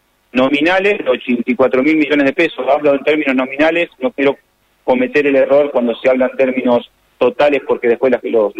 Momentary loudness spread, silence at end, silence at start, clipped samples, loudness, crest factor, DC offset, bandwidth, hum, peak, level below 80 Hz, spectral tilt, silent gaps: 5 LU; 0 s; 0.35 s; under 0.1%; -14 LUFS; 12 dB; under 0.1%; 8.4 kHz; none; -2 dBFS; -54 dBFS; -6 dB/octave; none